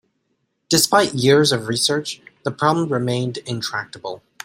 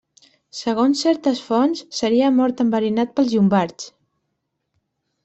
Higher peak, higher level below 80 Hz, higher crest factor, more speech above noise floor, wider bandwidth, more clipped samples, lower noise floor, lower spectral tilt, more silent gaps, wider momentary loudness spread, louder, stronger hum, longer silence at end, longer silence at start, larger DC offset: about the same, -2 dBFS vs -4 dBFS; about the same, -58 dBFS vs -62 dBFS; about the same, 18 dB vs 16 dB; second, 51 dB vs 57 dB; first, 16 kHz vs 8.2 kHz; neither; second, -70 dBFS vs -75 dBFS; second, -4 dB/octave vs -5.5 dB/octave; neither; first, 15 LU vs 11 LU; about the same, -19 LUFS vs -19 LUFS; neither; second, 0.3 s vs 1.35 s; first, 0.7 s vs 0.55 s; neither